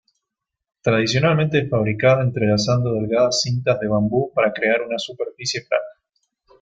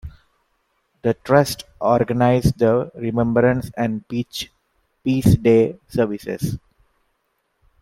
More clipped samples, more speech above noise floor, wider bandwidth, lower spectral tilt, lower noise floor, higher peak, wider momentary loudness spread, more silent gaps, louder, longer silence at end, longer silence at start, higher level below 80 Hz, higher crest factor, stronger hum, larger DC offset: neither; first, 63 dB vs 52 dB; second, 9.2 kHz vs 16.5 kHz; second, -5.5 dB/octave vs -7 dB/octave; first, -82 dBFS vs -70 dBFS; about the same, -4 dBFS vs -2 dBFS; second, 8 LU vs 11 LU; neither; about the same, -20 LUFS vs -19 LUFS; second, 0.7 s vs 1.25 s; first, 0.85 s vs 0.05 s; second, -52 dBFS vs -40 dBFS; about the same, 16 dB vs 18 dB; neither; neither